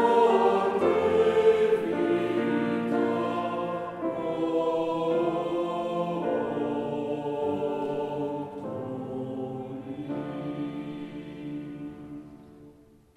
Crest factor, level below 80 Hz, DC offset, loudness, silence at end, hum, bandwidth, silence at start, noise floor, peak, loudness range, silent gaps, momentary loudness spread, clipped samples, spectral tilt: 18 dB; -64 dBFS; under 0.1%; -28 LUFS; 0.45 s; none; 11 kHz; 0 s; -55 dBFS; -10 dBFS; 11 LU; none; 15 LU; under 0.1%; -7 dB/octave